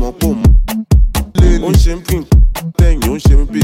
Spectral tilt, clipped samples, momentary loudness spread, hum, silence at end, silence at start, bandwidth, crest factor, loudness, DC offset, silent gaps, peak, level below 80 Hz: -6.5 dB/octave; under 0.1%; 4 LU; none; 0 s; 0 s; 16.5 kHz; 10 dB; -13 LUFS; under 0.1%; none; 0 dBFS; -12 dBFS